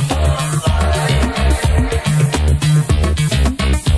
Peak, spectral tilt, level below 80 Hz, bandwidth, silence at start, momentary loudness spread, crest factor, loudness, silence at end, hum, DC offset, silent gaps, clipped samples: -2 dBFS; -5.5 dB/octave; -18 dBFS; 11 kHz; 0 s; 2 LU; 12 dB; -15 LUFS; 0 s; none; under 0.1%; none; under 0.1%